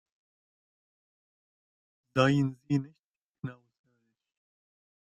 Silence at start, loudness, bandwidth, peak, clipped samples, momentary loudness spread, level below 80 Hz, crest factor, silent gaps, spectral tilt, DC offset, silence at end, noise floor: 2.15 s; -29 LUFS; 8.8 kHz; -10 dBFS; under 0.1%; 17 LU; -70 dBFS; 24 dB; 2.99-3.32 s; -7 dB/octave; under 0.1%; 1.5 s; under -90 dBFS